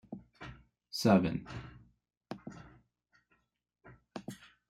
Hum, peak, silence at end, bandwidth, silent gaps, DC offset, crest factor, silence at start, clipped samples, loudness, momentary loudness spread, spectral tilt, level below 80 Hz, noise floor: none; -14 dBFS; 0.35 s; 15 kHz; 2.17-2.21 s; under 0.1%; 24 dB; 0.1 s; under 0.1%; -31 LUFS; 23 LU; -6 dB/octave; -64 dBFS; -80 dBFS